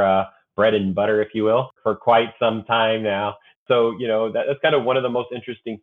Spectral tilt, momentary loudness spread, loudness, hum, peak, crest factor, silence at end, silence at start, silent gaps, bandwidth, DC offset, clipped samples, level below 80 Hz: -8 dB/octave; 8 LU; -20 LUFS; none; -4 dBFS; 16 dB; 0.05 s; 0 s; 3.56-3.66 s; 4.1 kHz; under 0.1%; under 0.1%; -64 dBFS